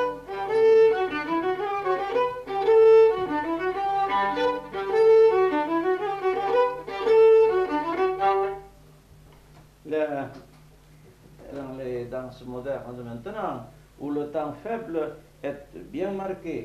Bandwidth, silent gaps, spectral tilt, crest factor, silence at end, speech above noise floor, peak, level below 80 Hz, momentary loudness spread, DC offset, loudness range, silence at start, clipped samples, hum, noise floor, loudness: 6.8 kHz; none; -6.5 dB/octave; 14 dB; 0 s; 20 dB; -10 dBFS; -56 dBFS; 19 LU; under 0.1%; 14 LU; 0 s; under 0.1%; none; -52 dBFS; -23 LUFS